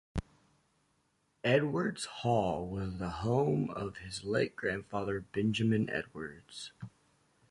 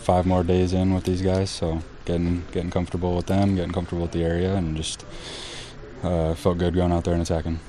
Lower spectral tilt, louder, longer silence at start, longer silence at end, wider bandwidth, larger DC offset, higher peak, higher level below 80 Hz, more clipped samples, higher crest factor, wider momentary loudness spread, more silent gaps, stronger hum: about the same, -6 dB/octave vs -6.5 dB/octave; second, -34 LUFS vs -24 LUFS; first, 0.15 s vs 0 s; first, 0.6 s vs 0 s; about the same, 11.5 kHz vs 11.5 kHz; second, under 0.1% vs 0.2%; second, -16 dBFS vs -4 dBFS; second, -54 dBFS vs -38 dBFS; neither; about the same, 18 dB vs 20 dB; about the same, 15 LU vs 13 LU; neither; neither